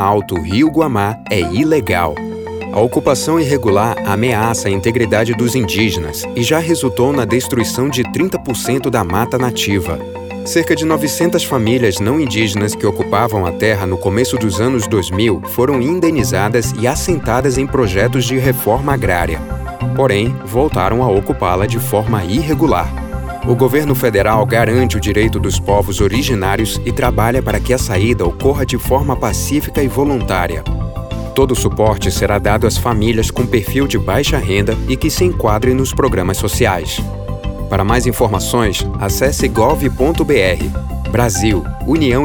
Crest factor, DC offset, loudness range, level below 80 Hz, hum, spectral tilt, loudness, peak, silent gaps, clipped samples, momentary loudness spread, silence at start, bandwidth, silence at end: 14 dB; under 0.1%; 2 LU; -26 dBFS; none; -5.5 dB/octave; -15 LUFS; 0 dBFS; none; under 0.1%; 5 LU; 0 s; over 20 kHz; 0 s